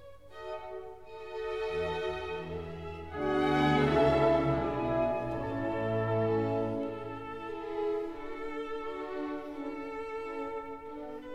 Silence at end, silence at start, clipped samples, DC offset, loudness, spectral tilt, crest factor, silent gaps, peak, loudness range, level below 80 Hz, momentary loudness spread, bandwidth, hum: 0 s; 0 s; under 0.1%; 0.2%; -33 LUFS; -7.5 dB/octave; 20 dB; none; -14 dBFS; 9 LU; -52 dBFS; 16 LU; 11 kHz; none